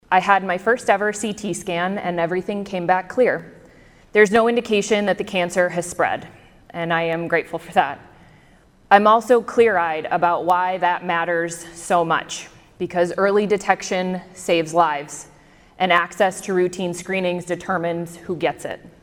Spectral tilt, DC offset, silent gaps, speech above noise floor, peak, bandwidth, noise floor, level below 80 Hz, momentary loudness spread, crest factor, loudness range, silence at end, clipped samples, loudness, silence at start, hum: -4.5 dB/octave; under 0.1%; none; 32 dB; 0 dBFS; 16.5 kHz; -52 dBFS; -56 dBFS; 12 LU; 20 dB; 4 LU; 0.15 s; under 0.1%; -20 LUFS; 0.1 s; none